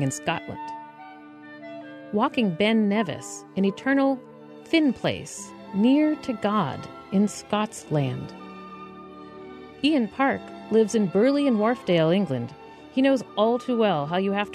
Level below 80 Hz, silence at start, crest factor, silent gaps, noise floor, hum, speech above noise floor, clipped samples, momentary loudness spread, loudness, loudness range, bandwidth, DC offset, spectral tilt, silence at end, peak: -64 dBFS; 0 s; 16 dB; none; -44 dBFS; none; 21 dB; under 0.1%; 21 LU; -24 LUFS; 5 LU; 13 kHz; under 0.1%; -5.5 dB/octave; 0 s; -8 dBFS